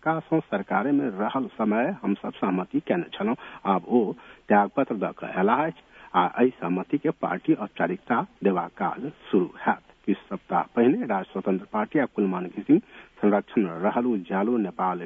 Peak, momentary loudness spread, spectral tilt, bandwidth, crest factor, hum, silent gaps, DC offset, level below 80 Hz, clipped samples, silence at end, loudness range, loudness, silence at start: -6 dBFS; 7 LU; -9.5 dB/octave; 3.8 kHz; 18 dB; none; none; under 0.1%; -66 dBFS; under 0.1%; 0 s; 2 LU; -26 LUFS; 0.05 s